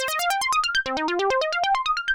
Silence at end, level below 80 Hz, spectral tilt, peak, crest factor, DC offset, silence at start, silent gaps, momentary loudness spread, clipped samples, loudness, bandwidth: 0 s; -54 dBFS; -0.5 dB/octave; -12 dBFS; 12 dB; under 0.1%; 0 s; none; 2 LU; under 0.1%; -22 LUFS; over 20 kHz